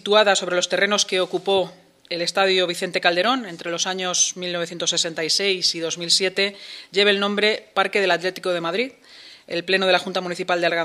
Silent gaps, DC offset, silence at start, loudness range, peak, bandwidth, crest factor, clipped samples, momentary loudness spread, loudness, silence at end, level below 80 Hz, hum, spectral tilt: none; under 0.1%; 0.05 s; 2 LU; 0 dBFS; 14 kHz; 22 dB; under 0.1%; 8 LU; -20 LUFS; 0 s; -76 dBFS; none; -2 dB/octave